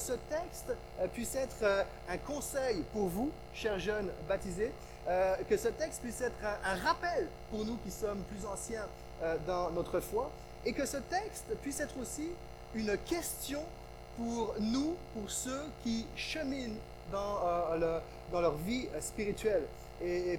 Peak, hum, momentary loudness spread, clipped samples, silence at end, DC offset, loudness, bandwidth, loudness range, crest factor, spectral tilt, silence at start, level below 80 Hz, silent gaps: -18 dBFS; 60 Hz at -55 dBFS; 9 LU; under 0.1%; 0 s; under 0.1%; -37 LUFS; over 20 kHz; 3 LU; 18 dB; -4.5 dB/octave; 0 s; -52 dBFS; none